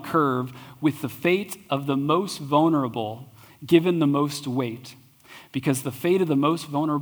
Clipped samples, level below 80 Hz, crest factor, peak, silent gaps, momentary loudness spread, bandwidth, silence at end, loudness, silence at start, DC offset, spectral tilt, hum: under 0.1%; -68 dBFS; 20 dB; -4 dBFS; none; 13 LU; over 20 kHz; 0 s; -24 LUFS; 0 s; under 0.1%; -6 dB/octave; none